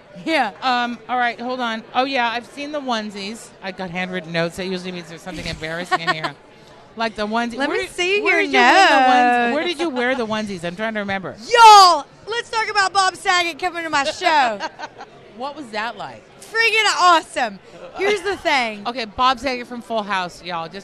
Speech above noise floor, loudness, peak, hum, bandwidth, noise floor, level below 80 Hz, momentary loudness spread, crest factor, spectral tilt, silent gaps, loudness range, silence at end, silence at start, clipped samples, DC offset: 26 dB; -18 LUFS; -2 dBFS; none; 13.5 kHz; -45 dBFS; -52 dBFS; 16 LU; 18 dB; -2.5 dB/octave; none; 11 LU; 0 s; 0.15 s; under 0.1%; under 0.1%